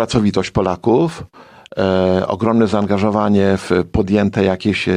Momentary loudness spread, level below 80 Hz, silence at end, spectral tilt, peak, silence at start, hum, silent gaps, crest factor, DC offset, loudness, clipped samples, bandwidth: 4 LU; -40 dBFS; 0 s; -7 dB/octave; -2 dBFS; 0 s; none; none; 14 dB; under 0.1%; -16 LUFS; under 0.1%; 10.5 kHz